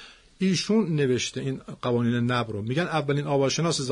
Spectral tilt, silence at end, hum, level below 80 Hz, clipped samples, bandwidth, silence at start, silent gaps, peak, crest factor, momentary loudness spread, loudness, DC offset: -5 dB/octave; 0 s; none; -60 dBFS; under 0.1%; 11 kHz; 0 s; none; -10 dBFS; 14 dB; 6 LU; -25 LUFS; under 0.1%